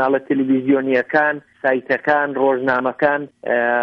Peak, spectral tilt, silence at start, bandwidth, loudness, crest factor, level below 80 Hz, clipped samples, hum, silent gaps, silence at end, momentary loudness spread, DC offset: -4 dBFS; -8 dB/octave; 0 s; 5.6 kHz; -18 LUFS; 14 dB; -64 dBFS; under 0.1%; none; none; 0 s; 4 LU; under 0.1%